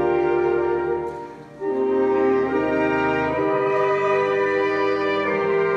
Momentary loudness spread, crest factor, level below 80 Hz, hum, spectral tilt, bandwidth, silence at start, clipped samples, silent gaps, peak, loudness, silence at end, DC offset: 7 LU; 12 dB; -52 dBFS; none; -7 dB/octave; 7.2 kHz; 0 s; under 0.1%; none; -10 dBFS; -21 LUFS; 0 s; under 0.1%